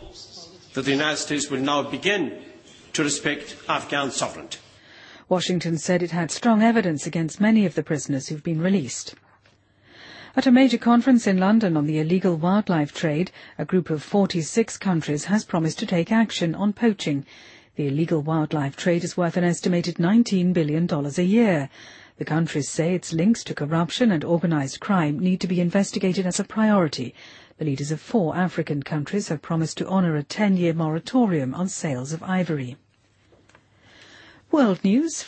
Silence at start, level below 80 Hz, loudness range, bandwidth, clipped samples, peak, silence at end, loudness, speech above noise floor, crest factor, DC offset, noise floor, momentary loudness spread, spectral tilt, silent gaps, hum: 0 s; -62 dBFS; 5 LU; 8.8 kHz; under 0.1%; -6 dBFS; 0 s; -23 LUFS; 38 dB; 18 dB; under 0.1%; -60 dBFS; 10 LU; -5.5 dB/octave; none; none